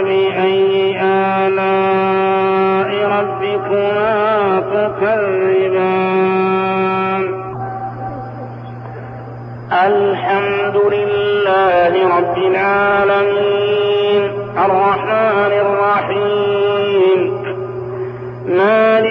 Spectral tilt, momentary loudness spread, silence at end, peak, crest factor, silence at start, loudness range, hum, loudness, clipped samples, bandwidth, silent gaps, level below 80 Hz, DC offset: -3.5 dB/octave; 12 LU; 0 s; -4 dBFS; 10 dB; 0 s; 5 LU; none; -14 LUFS; under 0.1%; 5.2 kHz; none; -52 dBFS; under 0.1%